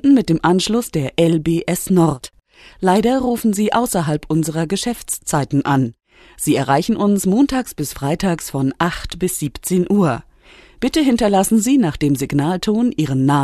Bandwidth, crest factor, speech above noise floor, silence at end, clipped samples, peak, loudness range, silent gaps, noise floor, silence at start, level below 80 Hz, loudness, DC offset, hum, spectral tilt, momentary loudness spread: 13.5 kHz; 14 dB; 29 dB; 0 s; under 0.1%; -4 dBFS; 2 LU; none; -46 dBFS; 0.05 s; -42 dBFS; -17 LUFS; under 0.1%; none; -5.5 dB/octave; 7 LU